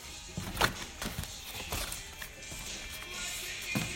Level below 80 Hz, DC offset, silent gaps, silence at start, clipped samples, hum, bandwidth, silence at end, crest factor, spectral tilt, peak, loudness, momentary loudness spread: -50 dBFS; under 0.1%; none; 0 s; under 0.1%; none; 16.5 kHz; 0 s; 26 dB; -2.5 dB/octave; -12 dBFS; -37 LUFS; 10 LU